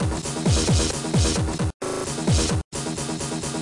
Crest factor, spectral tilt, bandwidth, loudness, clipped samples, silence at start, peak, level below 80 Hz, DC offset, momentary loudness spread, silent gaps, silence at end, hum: 12 dB; -4.5 dB/octave; 11.5 kHz; -23 LUFS; under 0.1%; 0 s; -12 dBFS; -32 dBFS; under 0.1%; 7 LU; 1.74-1.80 s, 2.64-2.71 s; 0 s; none